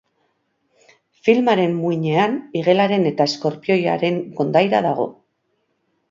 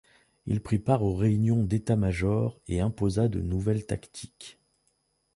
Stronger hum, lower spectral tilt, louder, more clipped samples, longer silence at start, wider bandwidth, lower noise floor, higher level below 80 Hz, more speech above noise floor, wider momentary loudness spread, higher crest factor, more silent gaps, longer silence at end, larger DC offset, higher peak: neither; second, -6.5 dB/octave vs -8 dB/octave; first, -19 LUFS vs -27 LUFS; neither; first, 1.25 s vs 0.45 s; second, 7.6 kHz vs 11.5 kHz; second, -69 dBFS vs -73 dBFS; second, -68 dBFS vs -44 dBFS; first, 51 dB vs 47 dB; second, 6 LU vs 18 LU; about the same, 18 dB vs 18 dB; neither; first, 1 s vs 0.85 s; neither; first, 0 dBFS vs -10 dBFS